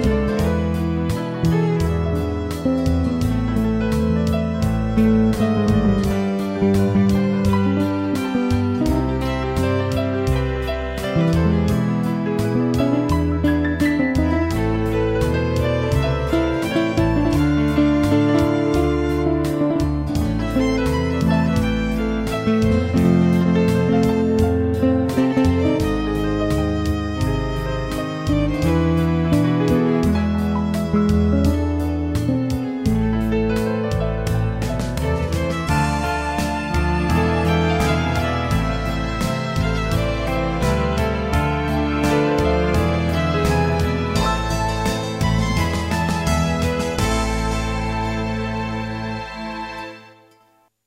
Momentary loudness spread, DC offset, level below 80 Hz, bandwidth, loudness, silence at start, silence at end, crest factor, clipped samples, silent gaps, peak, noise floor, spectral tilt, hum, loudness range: 5 LU; under 0.1%; -28 dBFS; 16 kHz; -20 LUFS; 0 s; 0.8 s; 14 dB; under 0.1%; none; -4 dBFS; -58 dBFS; -7 dB/octave; none; 3 LU